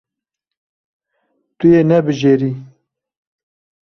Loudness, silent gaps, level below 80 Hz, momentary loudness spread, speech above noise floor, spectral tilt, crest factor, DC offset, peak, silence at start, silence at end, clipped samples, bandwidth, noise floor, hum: -14 LUFS; none; -56 dBFS; 10 LU; 70 dB; -8 dB/octave; 16 dB; under 0.1%; -2 dBFS; 1.6 s; 1.2 s; under 0.1%; 6.6 kHz; -82 dBFS; none